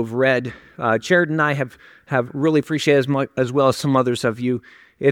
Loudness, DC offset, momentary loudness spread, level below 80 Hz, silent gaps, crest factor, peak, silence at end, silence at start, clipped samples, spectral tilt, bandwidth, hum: -20 LUFS; under 0.1%; 8 LU; -60 dBFS; none; 18 dB; -2 dBFS; 0 s; 0 s; under 0.1%; -6 dB/octave; 16.5 kHz; none